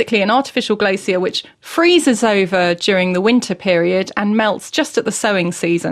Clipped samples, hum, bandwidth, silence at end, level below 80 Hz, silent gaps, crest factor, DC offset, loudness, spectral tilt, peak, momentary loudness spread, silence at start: under 0.1%; none; 14 kHz; 0 s; -58 dBFS; none; 14 dB; under 0.1%; -16 LUFS; -4.5 dB/octave; -2 dBFS; 6 LU; 0 s